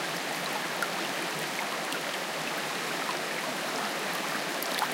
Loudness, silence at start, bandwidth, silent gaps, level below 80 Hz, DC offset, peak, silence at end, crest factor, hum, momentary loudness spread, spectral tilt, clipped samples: -31 LUFS; 0 s; 17 kHz; none; -86 dBFS; under 0.1%; -12 dBFS; 0 s; 20 dB; none; 1 LU; -2 dB/octave; under 0.1%